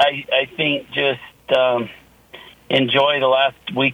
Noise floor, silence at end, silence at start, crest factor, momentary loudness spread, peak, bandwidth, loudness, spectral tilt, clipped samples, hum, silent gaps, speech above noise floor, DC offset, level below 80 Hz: -43 dBFS; 0 s; 0 s; 18 dB; 6 LU; 0 dBFS; 15.5 kHz; -18 LUFS; -5.5 dB/octave; under 0.1%; none; none; 25 dB; under 0.1%; -60 dBFS